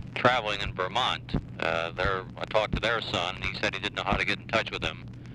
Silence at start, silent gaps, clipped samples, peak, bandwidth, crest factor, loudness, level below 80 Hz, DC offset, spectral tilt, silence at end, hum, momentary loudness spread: 0 s; none; under 0.1%; -8 dBFS; 12 kHz; 22 dB; -28 LUFS; -44 dBFS; under 0.1%; -4.5 dB/octave; 0 s; none; 6 LU